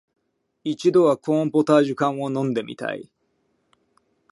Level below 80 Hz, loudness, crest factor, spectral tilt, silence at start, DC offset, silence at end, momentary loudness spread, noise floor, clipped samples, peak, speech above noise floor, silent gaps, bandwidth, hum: -72 dBFS; -21 LUFS; 20 dB; -7 dB/octave; 0.65 s; under 0.1%; 1.3 s; 13 LU; -69 dBFS; under 0.1%; -4 dBFS; 49 dB; none; 11.5 kHz; none